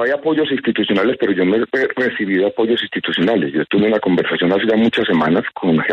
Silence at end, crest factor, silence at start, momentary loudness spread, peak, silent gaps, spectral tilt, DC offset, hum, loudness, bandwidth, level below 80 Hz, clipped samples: 0 s; 12 dB; 0 s; 3 LU; -4 dBFS; none; -7.5 dB/octave; under 0.1%; none; -16 LUFS; 7 kHz; -56 dBFS; under 0.1%